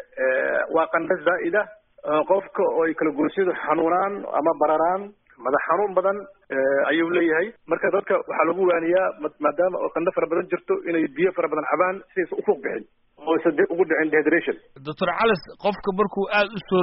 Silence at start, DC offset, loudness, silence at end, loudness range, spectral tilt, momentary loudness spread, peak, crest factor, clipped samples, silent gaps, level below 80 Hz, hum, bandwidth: 0.15 s; under 0.1%; -23 LUFS; 0 s; 2 LU; -3.5 dB/octave; 6 LU; -4 dBFS; 18 dB; under 0.1%; none; -62 dBFS; none; 4.5 kHz